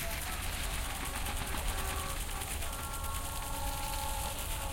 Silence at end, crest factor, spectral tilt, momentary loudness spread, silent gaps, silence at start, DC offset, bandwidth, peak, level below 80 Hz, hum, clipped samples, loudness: 0 s; 14 dB; -2.5 dB/octave; 2 LU; none; 0 s; under 0.1%; 17 kHz; -22 dBFS; -40 dBFS; none; under 0.1%; -37 LUFS